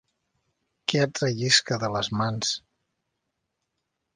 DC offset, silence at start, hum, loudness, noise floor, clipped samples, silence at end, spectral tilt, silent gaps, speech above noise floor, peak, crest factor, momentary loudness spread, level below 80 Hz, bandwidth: under 0.1%; 0.9 s; none; -25 LUFS; -80 dBFS; under 0.1%; 1.55 s; -3.5 dB/octave; none; 55 dB; -4 dBFS; 24 dB; 8 LU; -62 dBFS; 10 kHz